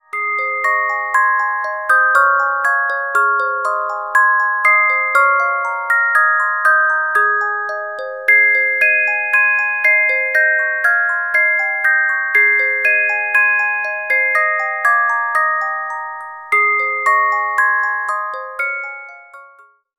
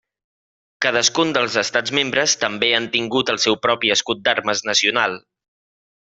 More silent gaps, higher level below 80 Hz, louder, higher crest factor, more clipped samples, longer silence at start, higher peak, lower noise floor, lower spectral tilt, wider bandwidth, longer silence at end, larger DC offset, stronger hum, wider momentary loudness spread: neither; second, -72 dBFS vs -62 dBFS; first, -14 LUFS vs -18 LUFS; about the same, 16 dB vs 18 dB; neither; second, 0.15 s vs 0.8 s; about the same, 0 dBFS vs -2 dBFS; second, -47 dBFS vs under -90 dBFS; second, 0 dB/octave vs -1.5 dB/octave; first, 15.5 kHz vs 8.2 kHz; second, 0.5 s vs 0.9 s; first, 0.1% vs under 0.1%; neither; first, 9 LU vs 4 LU